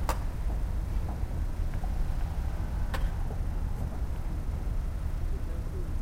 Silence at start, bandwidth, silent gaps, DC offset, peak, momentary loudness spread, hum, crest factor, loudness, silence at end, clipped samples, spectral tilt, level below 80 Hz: 0 s; 16 kHz; none; under 0.1%; -14 dBFS; 2 LU; none; 16 dB; -35 LUFS; 0 s; under 0.1%; -6.5 dB/octave; -32 dBFS